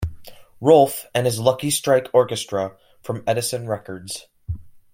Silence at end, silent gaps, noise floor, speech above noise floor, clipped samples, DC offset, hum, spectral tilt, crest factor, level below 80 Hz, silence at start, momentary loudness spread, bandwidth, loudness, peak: 0.15 s; none; -40 dBFS; 20 dB; under 0.1%; under 0.1%; none; -4.5 dB/octave; 20 dB; -46 dBFS; 0 s; 18 LU; 16.5 kHz; -20 LUFS; -2 dBFS